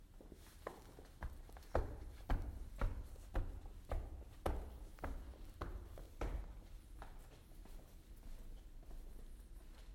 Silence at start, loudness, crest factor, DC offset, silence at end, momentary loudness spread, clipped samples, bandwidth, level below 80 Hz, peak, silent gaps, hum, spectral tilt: 0 s; -51 LUFS; 26 dB; under 0.1%; 0 s; 15 LU; under 0.1%; 16.5 kHz; -48 dBFS; -20 dBFS; none; none; -6.5 dB/octave